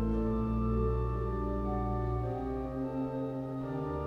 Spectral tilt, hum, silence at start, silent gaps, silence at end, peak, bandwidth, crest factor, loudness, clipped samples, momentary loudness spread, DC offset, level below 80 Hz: -10.5 dB/octave; none; 0 s; none; 0 s; -20 dBFS; 5.4 kHz; 12 dB; -34 LUFS; under 0.1%; 5 LU; under 0.1%; -38 dBFS